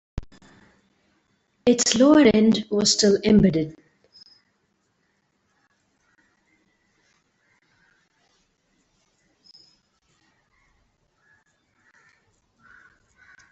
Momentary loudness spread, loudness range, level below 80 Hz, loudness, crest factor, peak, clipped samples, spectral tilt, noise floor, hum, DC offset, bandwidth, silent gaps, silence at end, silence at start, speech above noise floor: 16 LU; 7 LU; -52 dBFS; -18 LUFS; 22 dB; -2 dBFS; under 0.1%; -4.5 dB/octave; -70 dBFS; none; under 0.1%; 8.2 kHz; none; 9.8 s; 0.15 s; 53 dB